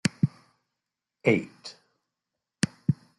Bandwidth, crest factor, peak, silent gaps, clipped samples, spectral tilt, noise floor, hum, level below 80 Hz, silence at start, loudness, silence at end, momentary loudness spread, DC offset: 12 kHz; 26 dB; -6 dBFS; none; under 0.1%; -6 dB/octave; -86 dBFS; none; -66 dBFS; 0.05 s; -28 LUFS; 0.25 s; 18 LU; under 0.1%